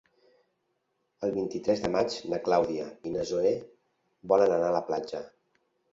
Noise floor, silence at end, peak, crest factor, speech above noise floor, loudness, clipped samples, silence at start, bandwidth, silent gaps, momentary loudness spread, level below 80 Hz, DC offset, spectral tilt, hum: -77 dBFS; 0.65 s; -8 dBFS; 20 dB; 50 dB; -29 LUFS; under 0.1%; 1.2 s; 7.8 kHz; none; 11 LU; -62 dBFS; under 0.1%; -5.5 dB/octave; none